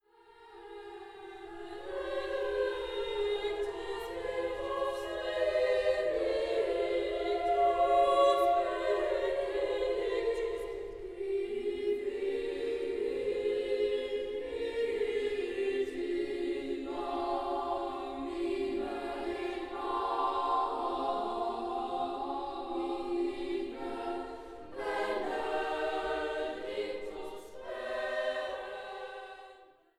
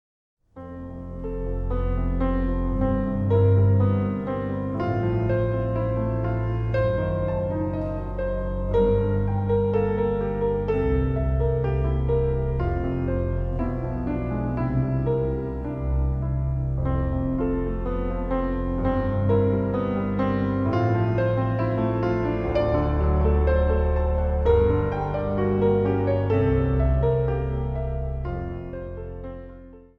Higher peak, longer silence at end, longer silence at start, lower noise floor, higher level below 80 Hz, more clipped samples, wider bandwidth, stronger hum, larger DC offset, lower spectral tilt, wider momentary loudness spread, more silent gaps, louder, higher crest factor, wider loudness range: second, -16 dBFS vs -8 dBFS; first, 0.35 s vs 0.15 s; second, 0.3 s vs 0.55 s; first, -58 dBFS vs -44 dBFS; second, -58 dBFS vs -30 dBFS; neither; first, 13.5 kHz vs 5.4 kHz; neither; neither; second, -4.5 dB/octave vs -11 dB/octave; first, 12 LU vs 8 LU; neither; second, -34 LUFS vs -24 LUFS; about the same, 18 dB vs 14 dB; first, 7 LU vs 4 LU